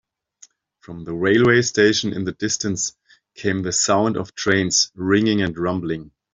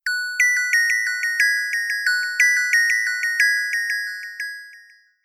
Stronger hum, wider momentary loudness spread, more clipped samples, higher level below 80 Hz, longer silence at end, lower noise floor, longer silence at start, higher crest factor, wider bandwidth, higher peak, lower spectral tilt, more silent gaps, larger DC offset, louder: neither; about the same, 11 LU vs 13 LU; neither; first, -54 dBFS vs -80 dBFS; second, 0.25 s vs 0.45 s; about the same, -52 dBFS vs -50 dBFS; first, 0.9 s vs 0.05 s; about the same, 18 dB vs 16 dB; second, 8.2 kHz vs 16 kHz; about the same, -4 dBFS vs -4 dBFS; first, -3.5 dB/octave vs 10.5 dB/octave; neither; neither; about the same, -19 LUFS vs -18 LUFS